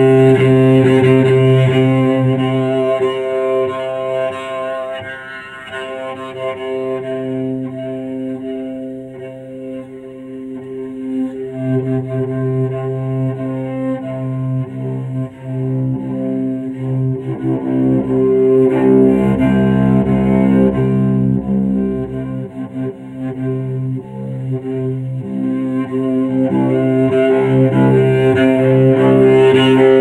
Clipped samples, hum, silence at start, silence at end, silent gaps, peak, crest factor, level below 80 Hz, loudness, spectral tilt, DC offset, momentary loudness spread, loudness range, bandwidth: under 0.1%; none; 0 s; 0 s; none; 0 dBFS; 14 dB; -42 dBFS; -15 LUFS; -9 dB/octave; under 0.1%; 15 LU; 11 LU; 9.8 kHz